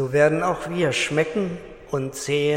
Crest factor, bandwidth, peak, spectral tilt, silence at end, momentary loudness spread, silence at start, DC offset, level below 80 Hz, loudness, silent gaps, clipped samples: 18 dB; 16 kHz; -4 dBFS; -5 dB/octave; 0 s; 11 LU; 0 s; under 0.1%; -52 dBFS; -23 LUFS; none; under 0.1%